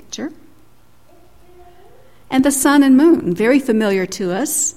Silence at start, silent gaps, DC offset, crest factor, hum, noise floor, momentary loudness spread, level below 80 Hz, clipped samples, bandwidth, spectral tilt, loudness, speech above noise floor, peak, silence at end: 0.1 s; none; 0.6%; 16 dB; none; -52 dBFS; 13 LU; -52 dBFS; under 0.1%; 16 kHz; -4 dB/octave; -14 LUFS; 38 dB; -2 dBFS; 0.05 s